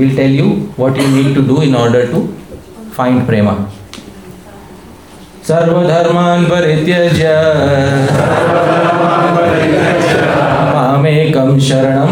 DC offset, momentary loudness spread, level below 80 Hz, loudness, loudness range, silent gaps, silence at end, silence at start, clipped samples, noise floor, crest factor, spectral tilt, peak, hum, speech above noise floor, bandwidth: 0.2%; 7 LU; -42 dBFS; -10 LUFS; 5 LU; none; 0 s; 0 s; under 0.1%; -34 dBFS; 10 dB; -6.5 dB/octave; 0 dBFS; none; 25 dB; 17.5 kHz